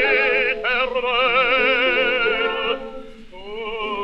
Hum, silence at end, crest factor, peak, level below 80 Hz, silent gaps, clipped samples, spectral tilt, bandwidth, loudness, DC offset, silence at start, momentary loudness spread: none; 0 s; 14 dB; -6 dBFS; -44 dBFS; none; under 0.1%; -4 dB/octave; 7 kHz; -18 LUFS; under 0.1%; 0 s; 14 LU